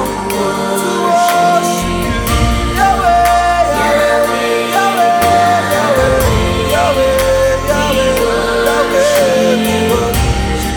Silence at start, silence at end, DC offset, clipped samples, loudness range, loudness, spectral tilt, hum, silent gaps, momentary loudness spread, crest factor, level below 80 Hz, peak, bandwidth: 0 s; 0 s; under 0.1%; under 0.1%; 1 LU; -12 LUFS; -4.5 dB/octave; none; none; 5 LU; 12 dB; -24 dBFS; 0 dBFS; 19.5 kHz